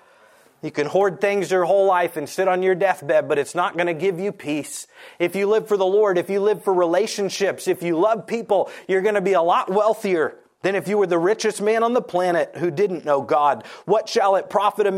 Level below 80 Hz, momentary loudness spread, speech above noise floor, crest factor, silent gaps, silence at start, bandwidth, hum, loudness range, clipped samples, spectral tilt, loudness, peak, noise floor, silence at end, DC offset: -74 dBFS; 7 LU; 33 dB; 16 dB; none; 0.65 s; 15.5 kHz; none; 2 LU; under 0.1%; -5 dB/octave; -20 LUFS; -4 dBFS; -53 dBFS; 0 s; under 0.1%